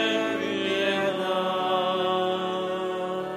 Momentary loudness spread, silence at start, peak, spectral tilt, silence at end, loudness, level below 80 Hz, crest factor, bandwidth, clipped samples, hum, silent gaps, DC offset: 4 LU; 0 s; -12 dBFS; -4.5 dB/octave; 0 s; -26 LUFS; -70 dBFS; 14 dB; 13.5 kHz; under 0.1%; none; none; under 0.1%